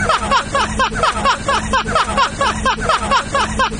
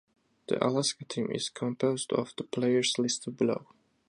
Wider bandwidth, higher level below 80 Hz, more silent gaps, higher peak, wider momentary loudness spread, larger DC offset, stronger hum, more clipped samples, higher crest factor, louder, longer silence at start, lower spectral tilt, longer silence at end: second, 10 kHz vs 11.5 kHz; first, -30 dBFS vs -74 dBFS; neither; first, -4 dBFS vs -10 dBFS; second, 2 LU vs 8 LU; neither; neither; neither; second, 14 dB vs 22 dB; first, -16 LUFS vs -30 LUFS; second, 0 s vs 0.5 s; about the same, -3 dB/octave vs -4 dB/octave; second, 0 s vs 0.45 s